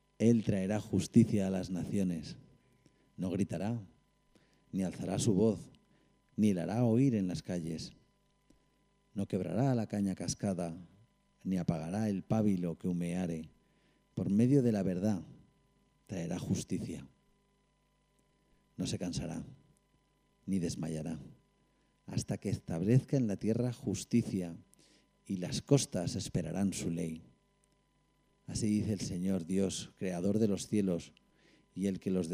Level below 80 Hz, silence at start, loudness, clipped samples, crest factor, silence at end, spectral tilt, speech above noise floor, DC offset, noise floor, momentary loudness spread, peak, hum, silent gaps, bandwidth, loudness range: -62 dBFS; 0.2 s; -34 LUFS; under 0.1%; 22 dB; 0 s; -6.5 dB/octave; 41 dB; under 0.1%; -74 dBFS; 14 LU; -12 dBFS; 50 Hz at -60 dBFS; none; 15.5 kHz; 8 LU